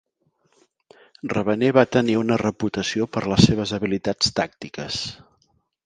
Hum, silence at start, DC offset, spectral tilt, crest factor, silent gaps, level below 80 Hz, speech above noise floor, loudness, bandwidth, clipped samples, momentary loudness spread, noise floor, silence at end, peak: none; 1.25 s; under 0.1%; -5 dB/octave; 22 dB; none; -46 dBFS; 46 dB; -21 LUFS; 9.6 kHz; under 0.1%; 11 LU; -67 dBFS; 0.7 s; 0 dBFS